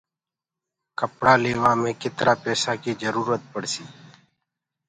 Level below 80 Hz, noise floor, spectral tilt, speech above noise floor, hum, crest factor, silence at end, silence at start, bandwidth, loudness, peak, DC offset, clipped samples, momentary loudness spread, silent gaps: -60 dBFS; -89 dBFS; -4 dB/octave; 66 dB; none; 24 dB; 0.95 s; 1 s; 10.5 kHz; -23 LUFS; -2 dBFS; under 0.1%; under 0.1%; 12 LU; none